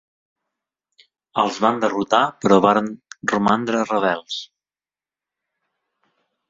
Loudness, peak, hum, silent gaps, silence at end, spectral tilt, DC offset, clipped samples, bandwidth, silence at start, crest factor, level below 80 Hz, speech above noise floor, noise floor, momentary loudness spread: -19 LUFS; -2 dBFS; none; none; 2.05 s; -5 dB/octave; under 0.1%; under 0.1%; 7.8 kHz; 1.35 s; 20 dB; -62 dBFS; over 71 dB; under -90 dBFS; 13 LU